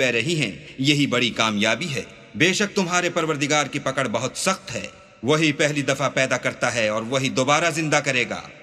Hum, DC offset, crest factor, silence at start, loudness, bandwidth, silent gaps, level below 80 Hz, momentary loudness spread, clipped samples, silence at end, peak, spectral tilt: none; under 0.1%; 20 dB; 0 s; -21 LUFS; 14 kHz; none; -60 dBFS; 8 LU; under 0.1%; 0 s; -2 dBFS; -3.5 dB/octave